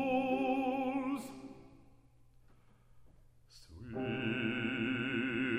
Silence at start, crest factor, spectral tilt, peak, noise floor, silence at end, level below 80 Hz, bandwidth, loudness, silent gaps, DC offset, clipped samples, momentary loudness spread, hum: 0 s; 16 dB; -6.5 dB/octave; -22 dBFS; -64 dBFS; 0 s; -64 dBFS; 14.5 kHz; -36 LUFS; none; under 0.1%; under 0.1%; 19 LU; none